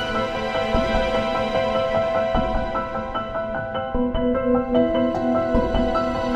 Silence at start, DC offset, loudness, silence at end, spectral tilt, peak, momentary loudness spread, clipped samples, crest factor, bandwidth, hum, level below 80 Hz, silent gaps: 0 s; under 0.1%; -22 LUFS; 0 s; -6.5 dB/octave; -6 dBFS; 6 LU; under 0.1%; 16 dB; 9.4 kHz; none; -32 dBFS; none